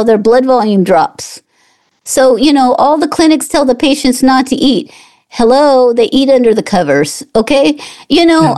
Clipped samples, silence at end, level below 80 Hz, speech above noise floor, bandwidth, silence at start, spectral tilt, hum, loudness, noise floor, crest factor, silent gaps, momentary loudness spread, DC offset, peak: under 0.1%; 0 s; -40 dBFS; 45 dB; 12.5 kHz; 0 s; -4.5 dB/octave; none; -9 LUFS; -53 dBFS; 10 dB; none; 8 LU; 0.9%; 0 dBFS